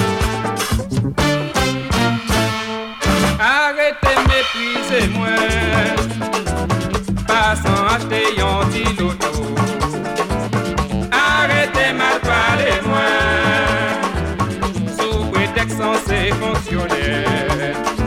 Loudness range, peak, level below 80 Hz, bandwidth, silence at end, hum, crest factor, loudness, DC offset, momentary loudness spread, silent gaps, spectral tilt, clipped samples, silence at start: 3 LU; -4 dBFS; -28 dBFS; 16.5 kHz; 0 s; none; 14 dB; -17 LUFS; under 0.1%; 6 LU; none; -4.5 dB/octave; under 0.1%; 0 s